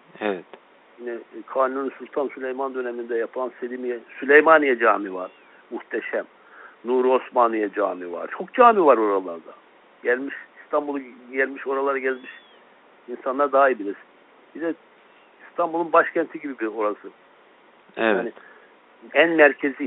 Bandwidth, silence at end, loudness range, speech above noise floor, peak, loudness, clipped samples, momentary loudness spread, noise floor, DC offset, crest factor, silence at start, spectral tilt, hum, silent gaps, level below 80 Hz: 4.1 kHz; 0 s; 7 LU; 32 dB; -2 dBFS; -22 LUFS; under 0.1%; 19 LU; -54 dBFS; under 0.1%; 22 dB; 0.2 s; -2 dB/octave; none; none; -76 dBFS